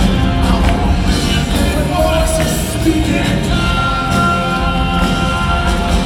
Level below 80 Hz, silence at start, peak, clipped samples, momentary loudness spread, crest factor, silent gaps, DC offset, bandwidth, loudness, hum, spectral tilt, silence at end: -18 dBFS; 0 s; 0 dBFS; under 0.1%; 2 LU; 12 dB; none; under 0.1%; 17 kHz; -14 LUFS; none; -5.5 dB/octave; 0 s